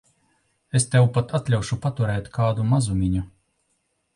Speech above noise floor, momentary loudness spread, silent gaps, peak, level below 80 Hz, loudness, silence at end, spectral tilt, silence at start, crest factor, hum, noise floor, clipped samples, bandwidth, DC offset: 50 dB; 7 LU; none; -6 dBFS; -42 dBFS; -23 LUFS; 0.85 s; -6 dB/octave; 0.75 s; 16 dB; none; -71 dBFS; under 0.1%; 11.5 kHz; under 0.1%